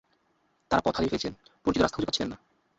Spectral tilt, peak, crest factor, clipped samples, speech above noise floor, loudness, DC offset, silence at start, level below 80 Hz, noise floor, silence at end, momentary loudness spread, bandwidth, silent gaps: -5 dB/octave; -10 dBFS; 20 dB; under 0.1%; 43 dB; -29 LUFS; under 0.1%; 0.7 s; -50 dBFS; -71 dBFS; 0.45 s; 10 LU; 8 kHz; none